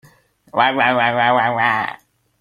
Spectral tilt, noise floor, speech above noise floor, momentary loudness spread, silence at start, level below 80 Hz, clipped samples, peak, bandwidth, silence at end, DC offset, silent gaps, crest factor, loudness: -6 dB/octave; -52 dBFS; 36 dB; 8 LU; 0.55 s; -62 dBFS; under 0.1%; -2 dBFS; 13 kHz; 0.45 s; under 0.1%; none; 16 dB; -16 LUFS